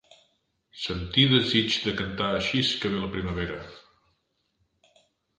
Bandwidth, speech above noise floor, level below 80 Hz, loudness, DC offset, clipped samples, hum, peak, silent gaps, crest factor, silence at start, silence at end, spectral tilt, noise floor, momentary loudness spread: 9.8 kHz; 48 dB; -48 dBFS; -25 LUFS; under 0.1%; under 0.1%; none; -6 dBFS; none; 24 dB; 0.75 s; 1.6 s; -5 dB/octave; -74 dBFS; 14 LU